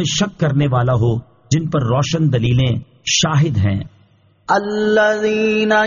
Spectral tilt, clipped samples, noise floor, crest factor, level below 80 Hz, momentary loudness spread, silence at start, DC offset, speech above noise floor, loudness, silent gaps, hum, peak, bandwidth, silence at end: -5 dB/octave; under 0.1%; -53 dBFS; 14 dB; -42 dBFS; 6 LU; 0 s; under 0.1%; 37 dB; -17 LUFS; none; none; -2 dBFS; 7.4 kHz; 0 s